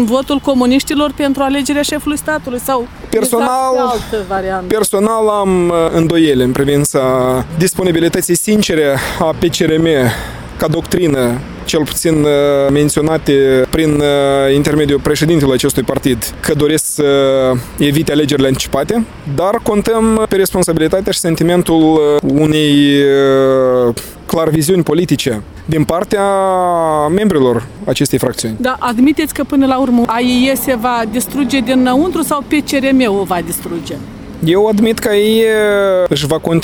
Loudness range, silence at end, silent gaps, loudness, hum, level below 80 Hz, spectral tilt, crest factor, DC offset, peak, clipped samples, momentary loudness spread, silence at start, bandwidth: 3 LU; 0 s; none; -12 LUFS; none; -34 dBFS; -5 dB/octave; 12 dB; under 0.1%; 0 dBFS; under 0.1%; 6 LU; 0 s; 19 kHz